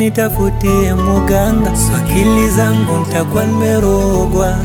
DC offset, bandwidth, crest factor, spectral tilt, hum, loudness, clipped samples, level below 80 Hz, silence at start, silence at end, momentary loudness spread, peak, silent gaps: under 0.1%; 19 kHz; 12 dB; -6 dB/octave; none; -13 LUFS; under 0.1%; -20 dBFS; 0 s; 0 s; 3 LU; 0 dBFS; none